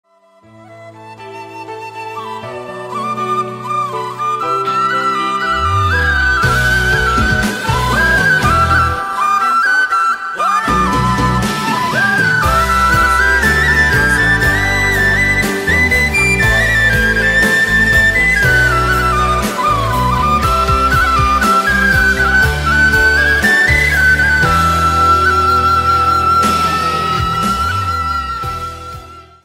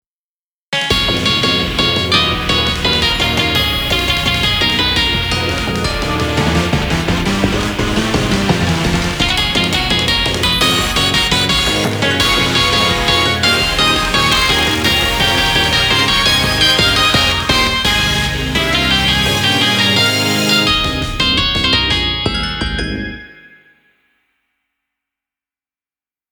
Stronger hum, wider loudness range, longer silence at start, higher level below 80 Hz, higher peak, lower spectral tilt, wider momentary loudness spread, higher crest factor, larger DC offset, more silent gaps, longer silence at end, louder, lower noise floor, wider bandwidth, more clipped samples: neither; about the same, 7 LU vs 5 LU; about the same, 0.7 s vs 0.7 s; about the same, -24 dBFS vs -28 dBFS; about the same, 0 dBFS vs 0 dBFS; about the same, -4 dB/octave vs -3.5 dB/octave; first, 10 LU vs 5 LU; about the same, 12 dB vs 14 dB; neither; neither; second, 0.25 s vs 3 s; about the same, -12 LUFS vs -12 LUFS; second, -46 dBFS vs under -90 dBFS; second, 16.5 kHz vs over 20 kHz; neither